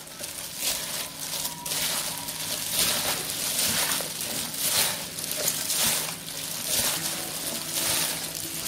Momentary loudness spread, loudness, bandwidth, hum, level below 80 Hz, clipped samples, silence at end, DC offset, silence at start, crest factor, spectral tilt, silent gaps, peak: 8 LU; -26 LUFS; 16.5 kHz; none; -58 dBFS; under 0.1%; 0 s; under 0.1%; 0 s; 20 dB; -0.5 dB/octave; none; -8 dBFS